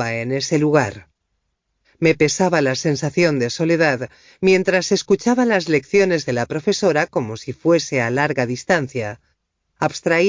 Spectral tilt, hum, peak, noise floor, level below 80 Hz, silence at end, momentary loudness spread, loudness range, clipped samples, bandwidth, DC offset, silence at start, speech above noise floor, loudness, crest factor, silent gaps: -5 dB/octave; none; -4 dBFS; -72 dBFS; -54 dBFS; 0 s; 8 LU; 2 LU; under 0.1%; 7.6 kHz; under 0.1%; 0 s; 54 dB; -18 LUFS; 16 dB; none